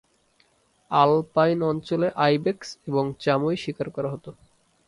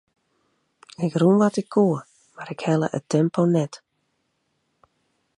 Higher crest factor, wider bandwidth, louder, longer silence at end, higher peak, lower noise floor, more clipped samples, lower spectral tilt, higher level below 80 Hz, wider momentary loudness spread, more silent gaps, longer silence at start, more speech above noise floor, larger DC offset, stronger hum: about the same, 22 dB vs 18 dB; about the same, 11.5 kHz vs 11 kHz; about the same, -24 LUFS vs -22 LUFS; second, 0.55 s vs 1.65 s; about the same, -4 dBFS vs -6 dBFS; second, -64 dBFS vs -73 dBFS; neither; about the same, -7 dB/octave vs -7.5 dB/octave; first, -62 dBFS vs -70 dBFS; about the same, 11 LU vs 13 LU; neither; about the same, 0.9 s vs 1 s; second, 41 dB vs 52 dB; neither; neither